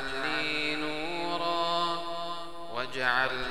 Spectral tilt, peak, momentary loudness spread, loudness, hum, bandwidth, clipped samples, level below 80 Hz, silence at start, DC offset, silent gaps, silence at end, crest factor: -3.5 dB/octave; -12 dBFS; 9 LU; -30 LUFS; none; 16 kHz; under 0.1%; -56 dBFS; 0 s; 1%; none; 0 s; 20 dB